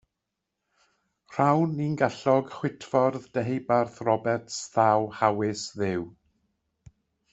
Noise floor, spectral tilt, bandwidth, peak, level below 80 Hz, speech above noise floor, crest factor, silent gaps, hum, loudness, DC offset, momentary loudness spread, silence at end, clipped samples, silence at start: -84 dBFS; -6 dB/octave; 8.2 kHz; -6 dBFS; -66 dBFS; 58 dB; 22 dB; none; none; -26 LUFS; under 0.1%; 8 LU; 1.2 s; under 0.1%; 1.3 s